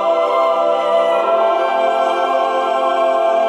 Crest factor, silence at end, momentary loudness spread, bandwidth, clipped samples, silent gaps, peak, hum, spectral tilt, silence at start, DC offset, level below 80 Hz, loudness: 12 dB; 0 s; 2 LU; 10.5 kHz; under 0.1%; none; -2 dBFS; none; -3 dB/octave; 0 s; under 0.1%; -76 dBFS; -15 LUFS